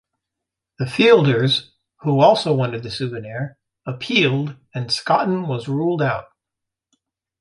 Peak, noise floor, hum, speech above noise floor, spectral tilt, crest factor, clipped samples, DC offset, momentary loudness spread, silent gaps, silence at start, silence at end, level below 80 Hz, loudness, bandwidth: -2 dBFS; -84 dBFS; none; 65 dB; -6 dB/octave; 18 dB; under 0.1%; under 0.1%; 15 LU; none; 0.8 s; 1.2 s; -58 dBFS; -19 LUFS; 11.5 kHz